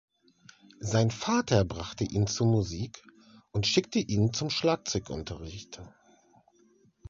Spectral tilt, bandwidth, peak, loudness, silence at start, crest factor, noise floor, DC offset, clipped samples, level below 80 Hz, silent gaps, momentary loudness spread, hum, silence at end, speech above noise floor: -5 dB/octave; 7.6 kHz; -10 dBFS; -29 LUFS; 0.8 s; 20 dB; -64 dBFS; under 0.1%; under 0.1%; -50 dBFS; none; 15 LU; none; 1.2 s; 35 dB